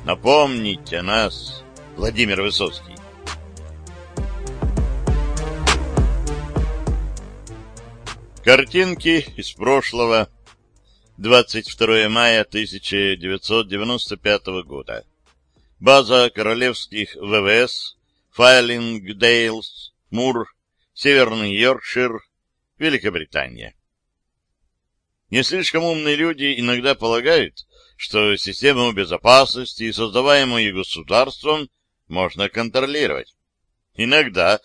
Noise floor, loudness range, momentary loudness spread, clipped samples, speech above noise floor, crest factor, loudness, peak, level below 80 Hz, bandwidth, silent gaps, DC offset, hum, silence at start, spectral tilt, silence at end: -75 dBFS; 7 LU; 19 LU; under 0.1%; 57 dB; 20 dB; -18 LUFS; 0 dBFS; -32 dBFS; 11 kHz; none; under 0.1%; none; 0 s; -4 dB/octave; 0.05 s